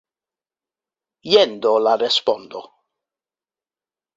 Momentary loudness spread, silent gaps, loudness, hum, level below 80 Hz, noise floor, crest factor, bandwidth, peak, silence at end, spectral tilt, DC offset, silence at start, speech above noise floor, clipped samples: 20 LU; none; -17 LUFS; none; -70 dBFS; under -90 dBFS; 20 dB; 7.8 kHz; -2 dBFS; 1.55 s; -3 dB/octave; under 0.1%; 1.25 s; over 72 dB; under 0.1%